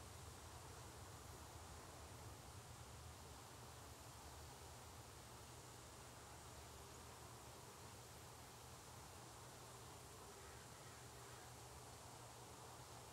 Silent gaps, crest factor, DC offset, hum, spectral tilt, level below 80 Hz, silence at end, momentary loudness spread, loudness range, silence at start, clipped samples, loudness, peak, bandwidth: none; 14 dB; under 0.1%; none; -3.5 dB/octave; -70 dBFS; 0 s; 1 LU; 1 LU; 0 s; under 0.1%; -58 LUFS; -44 dBFS; 16 kHz